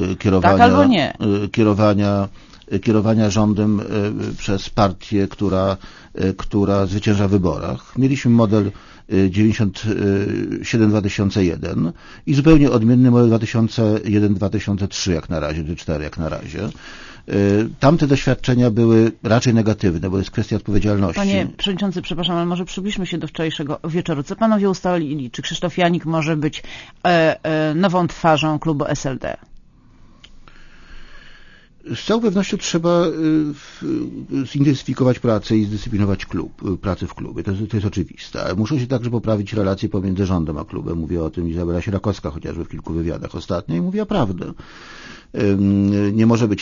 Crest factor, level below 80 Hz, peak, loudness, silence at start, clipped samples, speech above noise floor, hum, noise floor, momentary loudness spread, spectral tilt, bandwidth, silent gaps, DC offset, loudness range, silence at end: 18 dB; -38 dBFS; 0 dBFS; -19 LUFS; 0 s; under 0.1%; 29 dB; none; -47 dBFS; 11 LU; -6.5 dB/octave; 7.4 kHz; none; under 0.1%; 7 LU; 0 s